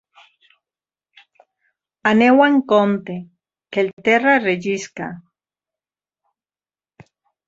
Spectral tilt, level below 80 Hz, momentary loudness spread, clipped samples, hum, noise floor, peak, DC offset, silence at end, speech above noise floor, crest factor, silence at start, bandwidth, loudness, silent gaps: -5.5 dB/octave; -66 dBFS; 18 LU; under 0.1%; none; under -90 dBFS; -2 dBFS; under 0.1%; 2.3 s; over 74 dB; 18 dB; 2.05 s; 7.8 kHz; -17 LUFS; 3.93-3.97 s